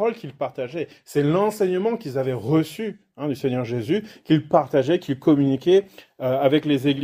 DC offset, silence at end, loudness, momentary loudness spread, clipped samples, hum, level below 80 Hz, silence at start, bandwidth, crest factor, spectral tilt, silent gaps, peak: under 0.1%; 0 s; -22 LUFS; 11 LU; under 0.1%; none; -64 dBFS; 0 s; 16 kHz; 18 dB; -7 dB/octave; none; -4 dBFS